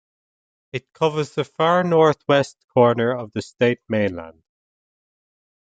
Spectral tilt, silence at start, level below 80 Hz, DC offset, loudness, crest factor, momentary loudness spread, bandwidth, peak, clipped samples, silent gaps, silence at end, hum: -6.5 dB/octave; 0.75 s; -64 dBFS; under 0.1%; -20 LUFS; 20 dB; 15 LU; 9 kHz; -2 dBFS; under 0.1%; 2.64-2.68 s; 1.45 s; none